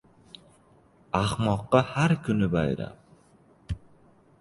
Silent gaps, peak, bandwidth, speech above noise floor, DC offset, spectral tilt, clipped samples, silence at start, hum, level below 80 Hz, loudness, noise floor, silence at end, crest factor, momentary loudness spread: none; -4 dBFS; 11.5 kHz; 34 dB; under 0.1%; -7 dB/octave; under 0.1%; 1.15 s; none; -48 dBFS; -26 LUFS; -59 dBFS; 0.65 s; 24 dB; 16 LU